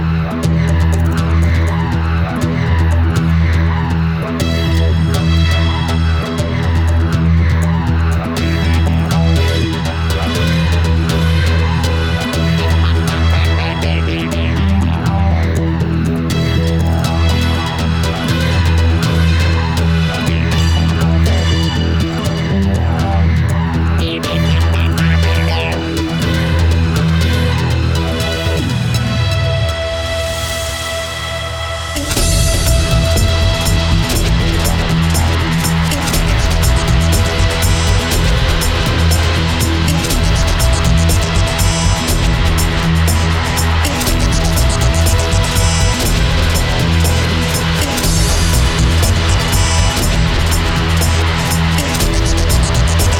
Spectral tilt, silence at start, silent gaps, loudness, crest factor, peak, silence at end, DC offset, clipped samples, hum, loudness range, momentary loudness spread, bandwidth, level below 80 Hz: -5 dB/octave; 0 s; none; -14 LUFS; 12 dB; 0 dBFS; 0 s; under 0.1%; under 0.1%; none; 2 LU; 3 LU; 16.5 kHz; -18 dBFS